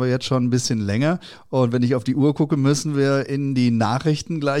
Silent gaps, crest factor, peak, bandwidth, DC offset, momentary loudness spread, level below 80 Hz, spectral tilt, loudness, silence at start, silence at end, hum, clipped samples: none; 12 dB; -8 dBFS; 12.5 kHz; under 0.1%; 4 LU; -56 dBFS; -6 dB/octave; -20 LUFS; 0 s; 0 s; none; under 0.1%